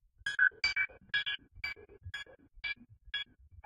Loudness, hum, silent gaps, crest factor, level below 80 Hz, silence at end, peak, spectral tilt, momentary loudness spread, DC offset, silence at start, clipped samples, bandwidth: -34 LUFS; none; none; 22 dB; -62 dBFS; 0.05 s; -16 dBFS; -1 dB/octave; 17 LU; under 0.1%; 0.25 s; under 0.1%; 13.5 kHz